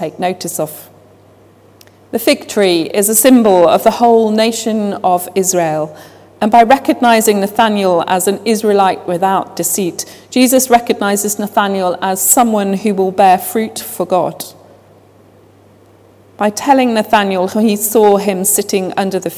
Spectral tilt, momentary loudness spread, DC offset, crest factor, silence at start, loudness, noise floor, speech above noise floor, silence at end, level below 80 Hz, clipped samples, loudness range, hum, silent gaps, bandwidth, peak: -3.5 dB/octave; 10 LU; under 0.1%; 12 dB; 0 s; -12 LUFS; -44 dBFS; 32 dB; 0 s; -54 dBFS; 0.3%; 6 LU; none; none; 16 kHz; 0 dBFS